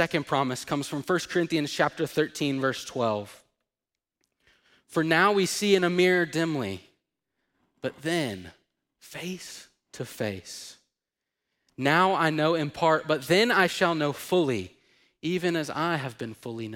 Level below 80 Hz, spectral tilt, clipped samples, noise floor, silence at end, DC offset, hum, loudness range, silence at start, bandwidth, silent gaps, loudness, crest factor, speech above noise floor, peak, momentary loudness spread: -68 dBFS; -4.5 dB/octave; under 0.1%; -89 dBFS; 0 s; under 0.1%; none; 11 LU; 0 s; 16.5 kHz; none; -26 LUFS; 20 dB; 63 dB; -8 dBFS; 16 LU